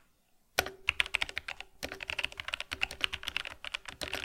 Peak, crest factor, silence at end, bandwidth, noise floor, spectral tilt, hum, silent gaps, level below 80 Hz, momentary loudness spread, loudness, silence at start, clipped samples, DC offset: -6 dBFS; 32 dB; 0 s; 16.5 kHz; -68 dBFS; -1 dB/octave; none; none; -56 dBFS; 9 LU; -35 LUFS; 0.55 s; under 0.1%; under 0.1%